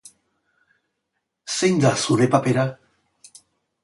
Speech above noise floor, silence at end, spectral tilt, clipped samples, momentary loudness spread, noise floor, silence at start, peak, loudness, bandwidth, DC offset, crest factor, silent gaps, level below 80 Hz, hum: 59 dB; 1.1 s; -5 dB/octave; under 0.1%; 10 LU; -78 dBFS; 1.45 s; -4 dBFS; -20 LUFS; 11.5 kHz; under 0.1%; 20 dB; none; -62 dBFS; none